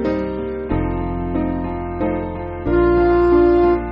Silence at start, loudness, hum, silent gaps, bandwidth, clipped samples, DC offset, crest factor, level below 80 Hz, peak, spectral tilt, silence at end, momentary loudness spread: 0 s; -18 LUFS; none; none; 5.2 kHz; under 0.1%; under 0.1%; 12 dB; -30 dBFS; -4 dBFS; -8 dB/octave; 0 s; 11 LU